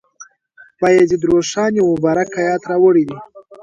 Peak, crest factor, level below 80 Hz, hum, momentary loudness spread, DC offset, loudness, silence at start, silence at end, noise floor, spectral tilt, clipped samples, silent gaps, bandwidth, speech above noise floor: -2 dBFS; 14 dB; -52 dBFS; none; 6 LU; under 0.1%; -15 LUFS; 0.2 s; 0.1 s; -48 dBFS; -5.5 dB/octave; under 0.1%; none; 7.8 kHz; 34 dB